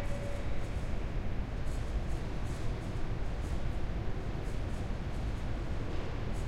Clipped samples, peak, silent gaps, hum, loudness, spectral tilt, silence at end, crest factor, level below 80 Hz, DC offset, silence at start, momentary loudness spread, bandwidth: under 0.1%; -20 dBFS; none; none; -39 LUFS; -6.5 dB/octave; 0 s; 12 dB; -36 dBFS; under 0.1%; 0 s; 1 LU; 11.5 kHz